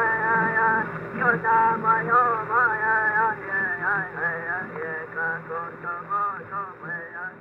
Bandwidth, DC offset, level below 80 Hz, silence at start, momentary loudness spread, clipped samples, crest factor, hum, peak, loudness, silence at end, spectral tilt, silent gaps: 5.6 kHz; under 0.1%; -62 dBFS; 0 s; 13 LU; under 0.1%; 16 dB; none; -10 dBFS; -23 LUFS; 0 s; -8.5 dB/octave; none